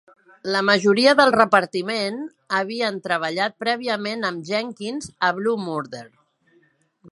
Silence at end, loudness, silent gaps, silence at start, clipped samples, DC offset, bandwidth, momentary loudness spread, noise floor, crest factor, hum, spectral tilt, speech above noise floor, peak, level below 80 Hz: 0 s; -21 LUFS; none; 0.45 s; under 0.1%; under 0.1%; 11.5 kHz; 15 LU; -61 dBFS; 22 dB; none; -4 dB/octave; 40 dB; 0 dBFS; -66 dBFS